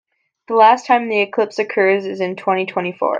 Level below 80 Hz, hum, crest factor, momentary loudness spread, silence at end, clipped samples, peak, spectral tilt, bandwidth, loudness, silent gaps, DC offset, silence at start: -72 dBFS; none; 16 dB; 9 LU; 0 s; under 0.1%; 0 dBFS; -5 dB/octave; 7.8 kHz; -16 LUFS; none; under 0.1%; 0.5 s